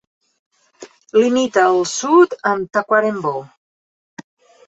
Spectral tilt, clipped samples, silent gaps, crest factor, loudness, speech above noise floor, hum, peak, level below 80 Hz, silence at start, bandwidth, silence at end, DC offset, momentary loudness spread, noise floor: -4 dB/octave; under 0.1%; 3.57-4.17 s; 16 dB; -16 LUFS; 27 dB; none; -2 dBFS; -66 dBFS; 0.8 s; 8.2 kHz; 0.45 s; under 0.1%; 9 LU; -43 dBFS